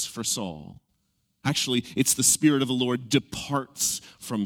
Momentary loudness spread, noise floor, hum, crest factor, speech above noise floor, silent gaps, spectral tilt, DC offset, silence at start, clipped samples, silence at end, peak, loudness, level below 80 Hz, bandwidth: 13 LU; -73 dBFS; none; 20 dB; 47 dB; none; -3 dB/octave; under 0.1%; 0 s; under 0.1%; 0 s; -6 dBFS; -24 LUFS; -60 dBFS; 18.5 kHz